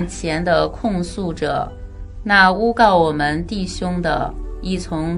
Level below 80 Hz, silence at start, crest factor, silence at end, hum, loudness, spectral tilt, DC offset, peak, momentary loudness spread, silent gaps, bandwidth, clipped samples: -32 dBFS; 0 s; 18 dB; 0 s; none; -18 LUFS; -5.5 dB/octave; under 0.1%; 0 dBFS; 15 LU; none; 11 kHz; under 0.1%